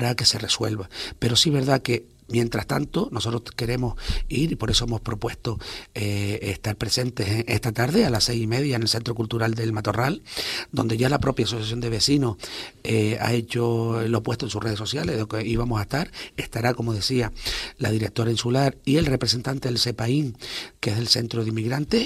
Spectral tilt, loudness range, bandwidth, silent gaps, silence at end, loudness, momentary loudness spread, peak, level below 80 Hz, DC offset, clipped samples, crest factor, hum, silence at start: -5 dB/octave; 3 LU; 15 kHz; none; 0 s; -24 LUFS; 8 LU; -4 dBFS; -40 dBFS; under 0.1%; under 0.1%; 20 dB; none; 0 s